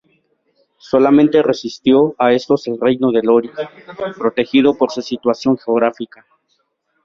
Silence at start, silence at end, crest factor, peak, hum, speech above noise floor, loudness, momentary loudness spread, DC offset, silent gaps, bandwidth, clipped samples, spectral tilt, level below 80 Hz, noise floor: 0.95 s; 1 s; 14 dB; -2 dBFS; none; 51 dB; -15 LUFS; 15 LU; under 0.1%; none; 7.2 kHz; under 0.1%; -6.5 dB/octave; -58 dBFS; -66 dBFS